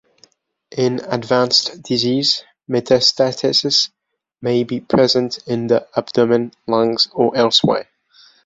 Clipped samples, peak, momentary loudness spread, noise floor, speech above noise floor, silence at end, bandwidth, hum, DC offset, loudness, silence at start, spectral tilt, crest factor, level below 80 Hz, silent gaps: under 0.1%; -2 dBFS; 9 LU; -55 dBFS; 38 dB; 0.65 s; 8 kHz; none; under 0.1%; -16 LUFS; 0.75 s; -4.5 dB/octave; 16 dB; -58 dBFS; none